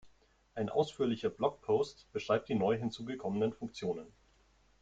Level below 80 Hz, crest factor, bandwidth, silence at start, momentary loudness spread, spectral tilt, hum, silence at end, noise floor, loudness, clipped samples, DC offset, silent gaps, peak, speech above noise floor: -68 dBFS; 20 dB; 8.6 kHz; 0.05 s; 8 LU; -6.5 dB/octave; none; 0.75 s; -68 dBFS; -35 LUFS; under 0.1%; under 0.1%; none; -16 dBFS; 34 dB